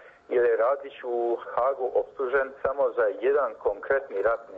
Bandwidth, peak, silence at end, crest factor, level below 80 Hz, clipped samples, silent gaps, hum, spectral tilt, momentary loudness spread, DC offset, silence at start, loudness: 4.3 kHz; -12 dBFS; 0 s; 16 dB; -62 dBFS; under 0.1%; none; none; -7 dB/octave; 5 LU; under 0.1%; 0.05 s; -26 LUFS